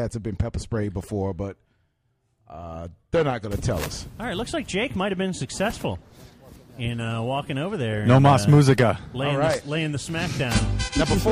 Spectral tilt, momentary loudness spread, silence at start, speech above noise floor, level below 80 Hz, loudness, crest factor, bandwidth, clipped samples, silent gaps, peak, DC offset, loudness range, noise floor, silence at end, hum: -6 dB/octave; 16 LU; 0 s; 47 dB; -38 dBFS; -24 LUFS; 18 dB; 15.5 kHz; under 0.1%; none; -6 dBFS; under 0.1%; 9 LU; -70 dBFS; 0 s; none